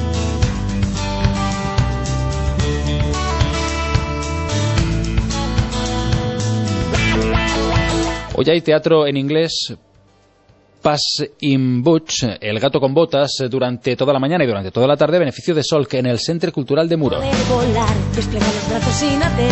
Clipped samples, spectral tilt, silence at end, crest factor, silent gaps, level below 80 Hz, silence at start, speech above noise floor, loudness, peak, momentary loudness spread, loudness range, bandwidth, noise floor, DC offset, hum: under 0.1%; -5.5 dB/octave; 0 s; 16 dB; none; -28 dBFS; 0 s; 36 dB; -18 LUFS; -2 dBFS; 5 LU; 3 LU; 8.4 kHz; -52 dBFS; under 0.1%; none